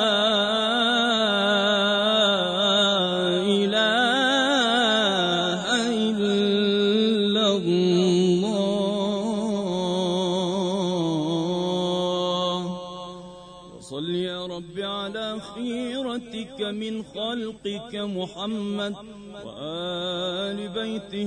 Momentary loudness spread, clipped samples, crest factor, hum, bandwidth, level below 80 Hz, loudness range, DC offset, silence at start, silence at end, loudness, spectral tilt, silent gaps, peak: 13 LU; under 0.1%; 16 dB; none; 10.5 kHz; -60 dBFS; 10 LU; under 0.1%; 0 s; 0 s; -23 LUFS; -4.5 dB/octave; none; -8 dBFS